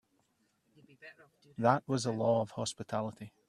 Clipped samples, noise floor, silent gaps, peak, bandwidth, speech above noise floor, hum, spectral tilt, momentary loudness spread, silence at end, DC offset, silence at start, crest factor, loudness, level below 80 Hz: under 0.1%; -75 dBFS; none; -10 dBFS; 12 kHz; 41 dB; none; -5.5 dB/octave; 24 LU; 0.2 s; under 0.1%; 1.05 s; 24 dB; -33 LUFS; -74 dBFS